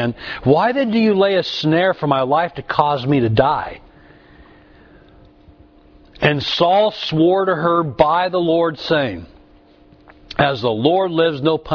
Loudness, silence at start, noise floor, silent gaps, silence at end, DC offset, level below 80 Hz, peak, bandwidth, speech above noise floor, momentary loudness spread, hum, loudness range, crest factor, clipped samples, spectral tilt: -17 LUFS; 0 s; -48 dBFS; none; 0 s; under 0.1%; -46 dBFS; 0 dBFS; 5.4 kHz; 32 dB; 5 LU; none; 6 LU; 18 dB; under 0.1%; -7 dB/octave